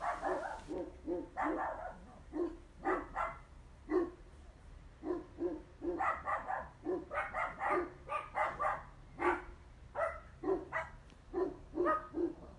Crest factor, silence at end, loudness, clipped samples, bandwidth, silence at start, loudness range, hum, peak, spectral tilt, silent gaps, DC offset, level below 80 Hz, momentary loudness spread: 20 dB; 0 s; -39 LUFS; under 0.1%; 10.5 kHz; 0 s; 3 LU; none; -20 dBFS; -6.5 dB/octave; none; under 0.1%; -58 dBFS; 19 LU